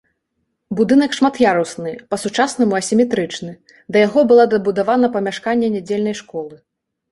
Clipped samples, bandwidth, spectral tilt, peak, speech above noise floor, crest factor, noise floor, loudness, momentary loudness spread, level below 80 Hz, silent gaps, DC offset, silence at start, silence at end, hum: under 0.1%; 11.5 kHz; -5 dB/octave; -2 dBFS; 56 dB; 16 dB; -72 dBFS; -16 LUFS; 15 LU; -58 dBFS; none; under 0.1%; 0.7 s; 0.55 s; none